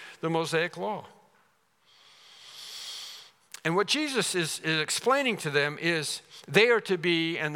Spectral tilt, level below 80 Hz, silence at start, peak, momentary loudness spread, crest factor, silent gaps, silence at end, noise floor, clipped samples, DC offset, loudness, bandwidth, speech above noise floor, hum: -3.5 dB/octave; -84 dBFS; 0 s; -4 dBFS; 17 LU; 26 dB; none; 0 s; -67 dBFS; under 0.1%; under 0.1%; -27 LUFS; 17.5 kHz; 40 dB; none